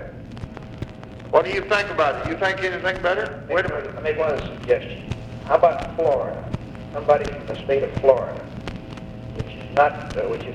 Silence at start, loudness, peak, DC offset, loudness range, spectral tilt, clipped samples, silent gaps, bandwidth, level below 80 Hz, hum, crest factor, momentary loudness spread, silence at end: 0 s; -22 LUFS; -2 dBFS; under 0.1%; 2 LU; -6 dB/octave; under 0.1%; none; 10.5 kHz; -42 dBFS; none; 22 dB; 17 LU; 0 s